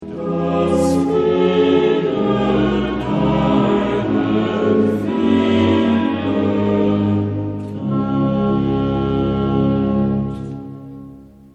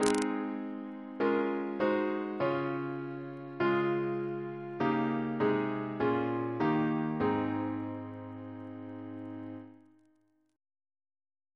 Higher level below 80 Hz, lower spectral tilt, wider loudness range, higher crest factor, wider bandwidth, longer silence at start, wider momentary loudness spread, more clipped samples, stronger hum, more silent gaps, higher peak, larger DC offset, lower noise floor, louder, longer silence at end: first, -38 dBFS vs -70 dBFS; first, -8 dB/octave vs -6.5 dB/octave; second, 2 LU vs 12 LU; second, 14 dB vs 26 dB; about the same, 11.5 kHz vs 11 kHz; about the same, 0 s vs 0 s; second, 9 LU vs 14 LU; neither; neither; neither; first, -2 dBFS vs -8 dBFS; neither; second, -39 dBFS vs -71 dBFS; first, -17 LUFS vs -33 LUFS; second, 0.3 s vs 1.8 s